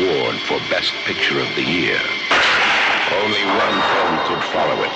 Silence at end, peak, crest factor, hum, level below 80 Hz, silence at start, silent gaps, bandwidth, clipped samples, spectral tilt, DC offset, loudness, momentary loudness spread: 0 s; -6 dBFS; 12 dB; none; -52 dBFS; 0 s; none; 9 kHz; under 0.1%; -3.5 dB/octave; under 0.1%; -17 LUFS; 6 LU